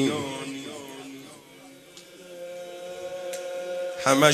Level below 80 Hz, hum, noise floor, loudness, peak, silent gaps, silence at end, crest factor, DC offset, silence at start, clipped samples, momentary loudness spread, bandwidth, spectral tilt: -70 dBFS; none; -49 dBFS; -30 LUFS; -4 dBFS; none; 0 s; 26 dB; under 0.1%; 0 s; under 0.1%; 20 LU; 14 kHz; -3.5 dB/octave